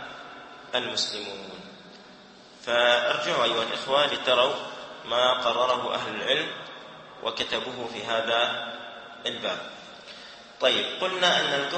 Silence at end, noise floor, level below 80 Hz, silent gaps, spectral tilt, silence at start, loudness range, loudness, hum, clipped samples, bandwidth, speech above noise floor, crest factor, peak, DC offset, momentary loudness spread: 0 s; -50 dBFS; -70 dBFS; none; -2 dB/octave; 0 s; 5 LU; -25 LUFS; none; under 0.1%; 8.8 kHz; 24 dB; 22 dB; -6 dBFS; under 0.1%; 20 LU